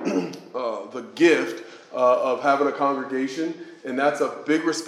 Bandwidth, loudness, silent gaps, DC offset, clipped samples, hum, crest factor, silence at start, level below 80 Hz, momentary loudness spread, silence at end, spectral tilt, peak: 12.5 kHz; -23 LUFS; none; under 0.1%; under 0.1%; none; 20 dB; 0 s; -86 dBFS; 14 LU; 0 s; -4.5 dB/octave; -4 dBFS